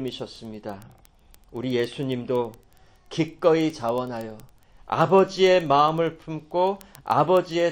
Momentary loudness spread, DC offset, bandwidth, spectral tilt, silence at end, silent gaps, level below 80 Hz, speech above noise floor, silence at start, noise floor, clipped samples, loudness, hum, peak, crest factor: 18 LU; under 0.1%; 17 kHz; -6 dB/octave; 0 s; none; -58 dBFS; 30 dB; 0 s; -53 dBFS; under 0.1%; -23 LUFS; none; -4 dBFS; 20 dB